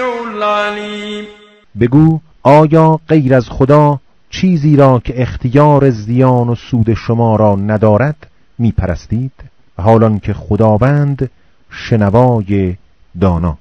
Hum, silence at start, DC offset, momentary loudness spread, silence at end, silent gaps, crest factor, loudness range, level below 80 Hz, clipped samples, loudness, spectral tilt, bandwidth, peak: none; 0 s; 0.4%; 11 LU; 0.05 s; none; 12 dB; 4 LU; -34 dBFS; 1%; -12 LUFS; -9 dB/octave; 8.2 kHz; 0 dBFS